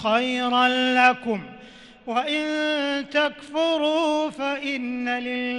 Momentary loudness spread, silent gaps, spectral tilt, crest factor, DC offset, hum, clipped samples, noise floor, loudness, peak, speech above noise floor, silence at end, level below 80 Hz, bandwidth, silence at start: 9 LU; none; -3.5 dB/octave; 20 dB; under 0.1%; none; under 0.1%; -46 dBFS; -23 LUFS; -4 dBFS; 23 dB; 0 s; -62 dBFS; 10.5 kHz; 0 s